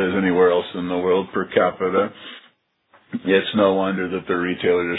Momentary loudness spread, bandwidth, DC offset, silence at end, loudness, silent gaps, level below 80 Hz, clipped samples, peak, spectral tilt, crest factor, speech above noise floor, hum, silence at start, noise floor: 10 LU; 4.1 kHz; under 0.1%; 0 s; -20 LUFS; none; -60 dBFS; under 0.1%; -4 dBFS; -9.5 dB/octave; 18 dB; 38 dB; none; 0 s; -58 dBFS